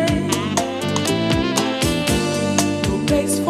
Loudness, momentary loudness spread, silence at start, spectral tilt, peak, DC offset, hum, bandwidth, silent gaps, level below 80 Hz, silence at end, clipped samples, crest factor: -19 LUFS; 2 LU; 0 s; -4.5 dB/octave; -2 dBFS; under 0.1%; none; 15.5 kHz; none; -36 dBFS; 0 s; under 0.1%; 18 dB